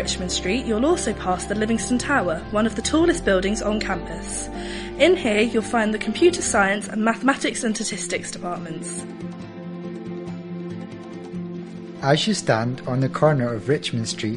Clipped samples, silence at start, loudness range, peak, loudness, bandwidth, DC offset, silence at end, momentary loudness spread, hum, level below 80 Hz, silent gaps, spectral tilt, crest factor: under 0.1%; 0 s; 10 LU; -4 dBFS; -22 LUFS; 11 kHz; under 0.1%; 0 s; 14 LU; none; -42 dBFS; none; -4.5 dB/octave; 20 dB